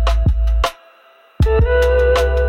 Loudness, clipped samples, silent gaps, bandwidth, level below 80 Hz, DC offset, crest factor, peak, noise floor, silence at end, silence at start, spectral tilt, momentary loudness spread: -16 LUFS; under 0.1%; none; 13 kHz; -18 dBFS; under 0.1%; 10 dB; -4 dBFS; -48 dBFS; 0 s; 0 s; -6 dB/octave; 6 LU